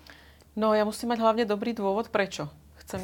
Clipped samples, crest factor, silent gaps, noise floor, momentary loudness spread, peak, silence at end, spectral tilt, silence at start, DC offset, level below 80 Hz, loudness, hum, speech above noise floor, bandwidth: under 0.1%; 20 dB; none; -52 dBFS; 14 LU; -8 dBFS; 0 s; -5 dB/octave; 0.1 s; under 0.1%; -58 dBFS; -27 LUFS; none; 26 dB; 18 kHz